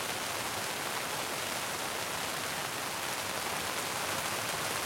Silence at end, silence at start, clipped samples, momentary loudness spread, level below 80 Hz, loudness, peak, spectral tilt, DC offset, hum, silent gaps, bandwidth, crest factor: 0 s; 0 s; under 0.1%; 2 LU; -66 dBFS; -34 LUFS; -16 dBFS; -1.5 dB/octave; under 0.1%; none; none; 16.5 kHz; 18 dB